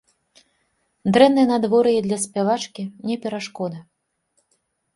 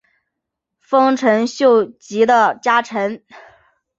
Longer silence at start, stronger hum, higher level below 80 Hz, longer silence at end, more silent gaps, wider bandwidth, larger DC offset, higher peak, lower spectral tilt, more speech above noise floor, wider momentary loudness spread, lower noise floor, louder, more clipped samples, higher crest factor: first, 1.05 s vs 0.9 s; neither; about the same, -64 dBFS vs -66 dBFS; first, 1.15 s vs 0.6 s; neither; first, 11.5 kHz vs 7.8 kHz; neither; about the same, 0 dBFS vs -2 dBFS; about the same, -5 dB/octave vs -4.5 dB/octave; second, 51 dB vs 64 dB; first, 15 LU vs 10 LU; second, -70 dBFS vs -80 dBFS; second, -20 LUFS vs -16 LUFS; neither; about the same, 20 dB vs 16 dB